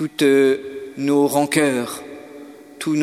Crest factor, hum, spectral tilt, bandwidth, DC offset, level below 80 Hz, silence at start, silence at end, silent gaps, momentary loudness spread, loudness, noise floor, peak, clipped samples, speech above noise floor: 18 dB; none; -4.5 dB/octave; 15 kHz; under 0.1%; -66 dBFS; 0 s; 0 s; none; 22 LU; -19 LUFS; -39 dBFS; -2 dBFS; under 0.1%; 22 dB